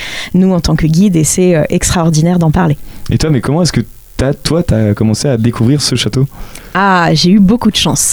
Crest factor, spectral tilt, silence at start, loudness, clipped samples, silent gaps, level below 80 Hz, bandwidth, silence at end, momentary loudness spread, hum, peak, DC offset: 10 dB; -5 dB/octave; 0 s; -11 LUFS; under 0.1%; none; -28 dBFS; over 20 kHz; 0 s; 8 LU; none; 0 dBFS; under 0.1%